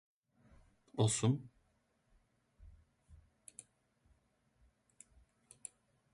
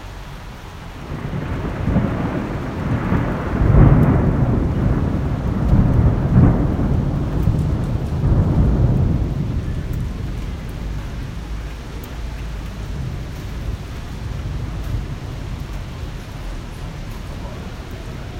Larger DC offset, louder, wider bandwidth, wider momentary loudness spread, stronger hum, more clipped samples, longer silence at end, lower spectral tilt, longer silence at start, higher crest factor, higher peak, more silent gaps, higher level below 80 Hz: neither; second, -36 LUFS vs -20 LUFS; second, 11.5 kHz vs 16 kHz; first, 25 LU vs 16 LU; neither; neither; first, 3 s vs 0 s; second, -5 dB/octave vs -8.5 dB/octave; first, 0.95 s vs 0 s; about the same, 24 dB vs 20 dB; second, -20 dBFS vs 0 dBFS; neither; second, -68 dBFS vs -24 dBFS